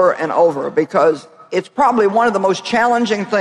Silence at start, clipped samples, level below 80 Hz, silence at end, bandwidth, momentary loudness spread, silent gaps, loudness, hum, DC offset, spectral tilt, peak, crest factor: 0 s; under 0.1%; -58 dBFS; 0 s; 11.5 kHz; 8 LU; none; -15 LUFS; none; under 0.1%; -5 dB/octave; -2 dBFS; 12 dB